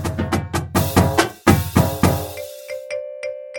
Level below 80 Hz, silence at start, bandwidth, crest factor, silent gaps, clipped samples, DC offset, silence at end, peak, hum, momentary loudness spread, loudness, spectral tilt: -36 dBFS; 0 s; 18.5 kHz; 20 dB; none; under 0.1%; under 0.1%; 0 s; 0 dBFS; none; 14 LU; -19 LUFS; -5.5 dB/octave